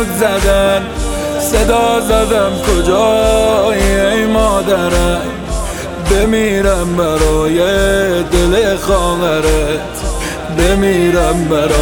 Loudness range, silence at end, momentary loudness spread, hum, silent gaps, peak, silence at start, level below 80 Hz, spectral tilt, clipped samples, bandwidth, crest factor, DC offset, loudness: 2 LU; 0 s; 8 LU; none; none; 0 dBFS; 0 s; -20 dBFS; -4.5 dB/octave; under 0.1%; 19 kHz; 12 dB; under 0.1%; -13 LUFS